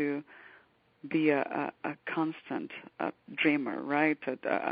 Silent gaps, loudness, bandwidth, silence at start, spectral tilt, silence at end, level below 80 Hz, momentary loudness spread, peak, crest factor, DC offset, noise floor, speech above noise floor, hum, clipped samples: none; -32 LUFS; 4.9 kHz; 0 s; -3.5 dB/octave; 0 s; -82 dBFS; 11 LU; -12 dBFS; 20 dB; under 0.1%; -62 dBFS; 31 dB; none; under 0.1%